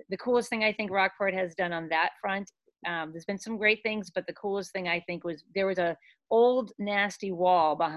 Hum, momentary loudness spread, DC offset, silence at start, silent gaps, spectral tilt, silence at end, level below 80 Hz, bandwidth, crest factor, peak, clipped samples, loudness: none; 11 LU; under 0.1%; 0.1 s; none; -4.5 dB/octave; 0 s; -70 dBFS; 12 kHz; 18 dB; -10 dBFS; under 0.1%; -29 LUFS